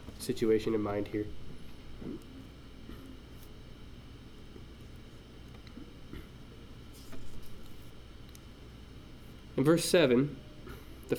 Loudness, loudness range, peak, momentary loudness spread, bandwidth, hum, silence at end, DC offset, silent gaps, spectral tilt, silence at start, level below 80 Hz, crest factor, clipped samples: -30 LUFS; 19 LU; -12 dBFS; 24 LU; 19 kHz; none; 0 s; under 0.1%; none; -5.5 dB/octave; 0 s; -52 dBFS; 22 dB; under 0.1%